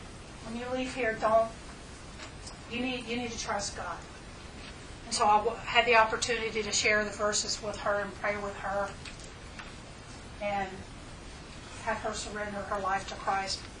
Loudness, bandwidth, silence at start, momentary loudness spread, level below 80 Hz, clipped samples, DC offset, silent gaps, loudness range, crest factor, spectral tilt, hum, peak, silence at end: -30 LUFS; 10.5 kHz; 0 s; 20 LU; -50 dBFS; under 0.1%; under 0.1%; none; 11 LU; 26 dB; -2.5 dB/octave; none; -6 dBFS; 0 s